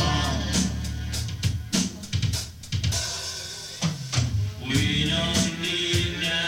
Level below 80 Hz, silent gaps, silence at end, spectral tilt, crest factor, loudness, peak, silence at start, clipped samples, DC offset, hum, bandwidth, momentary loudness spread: -36 dBFS; none; 0 s; -3.5 dB/octave; 16 dB; -26 LUFS; -10 dBFS; 0 s; under 0.1%; under 0.1%; none; 16.5 kHz; 8 LU